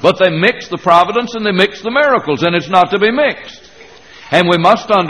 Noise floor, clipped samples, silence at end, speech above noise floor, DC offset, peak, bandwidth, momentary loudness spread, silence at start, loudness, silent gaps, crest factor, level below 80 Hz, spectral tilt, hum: -39 dBFS; 0.1%; 0 s; 27 dB; 0.3%; 0 dBFS; 11 kHz; 6 LU; 0 s; -12 LUFS; none; 12 dB; -52 dBFS; -5.5 dB/octave; none